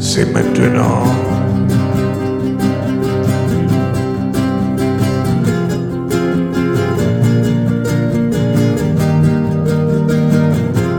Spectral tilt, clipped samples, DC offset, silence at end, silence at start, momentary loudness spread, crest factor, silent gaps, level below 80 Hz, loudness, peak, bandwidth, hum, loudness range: -7 dB/octave; under 0.1%; under 0.1%; 0 s; 0 s; 4 LU; 14 dB; none; -36 dBFS; -14 LUFS; 0 dBFS; 19 kHz; none; 2 LU